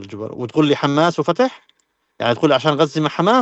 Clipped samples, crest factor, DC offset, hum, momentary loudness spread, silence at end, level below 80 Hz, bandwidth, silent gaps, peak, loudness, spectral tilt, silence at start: under 0.1%; 14 dB; under 0.1%; none; 7 LU; 0 s; -64 dBFS; 8.2 kHz; none; -2 dBFS; -17 LUFS; -6 dB/octave; 0 s